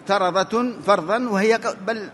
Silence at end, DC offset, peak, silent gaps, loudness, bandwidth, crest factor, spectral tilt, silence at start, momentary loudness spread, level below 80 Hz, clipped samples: 0 s; under 0.1%; -4 dBFS; none; -21 LUFS; 11.5 kHz; 18 dB; -5 dB/octave; 0 s; 4 LU; -66 dBFS; under 0.1%